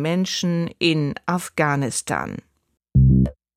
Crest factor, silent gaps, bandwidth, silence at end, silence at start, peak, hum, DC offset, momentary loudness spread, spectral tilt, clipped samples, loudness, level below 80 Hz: 16 dB; none; 15 kHz; 0.25 s; 0 s; -4 dBFS; none; under 0.1%; 10 LU; -5.5 dB/octave; under 0.1%; -21 LUFS; -32 dBFS